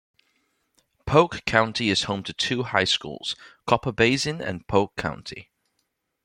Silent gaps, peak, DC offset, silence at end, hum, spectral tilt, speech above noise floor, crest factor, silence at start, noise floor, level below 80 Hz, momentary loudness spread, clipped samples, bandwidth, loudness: none; -2 dBFS; under 0.1%; 0.8 s; none; -4 dB/octave; 52 dB; 24 dB; 1.05 s; -76 dBFS; -52 dBFS; 12 LU; under 0.1%; 15.5 kHz; -23 LUFS